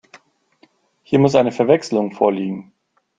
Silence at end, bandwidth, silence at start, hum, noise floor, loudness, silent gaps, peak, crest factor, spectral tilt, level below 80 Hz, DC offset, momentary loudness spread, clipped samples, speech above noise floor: 0.55 s; 9.2 kHz; 1.1 s; none; -57 dBFS; -17 LUFS; none; 0 dBFS; 18 dB; -7 dB/octave; -60 dBFS; under 0.1%; 11 LU; under 0.1%; 41 dB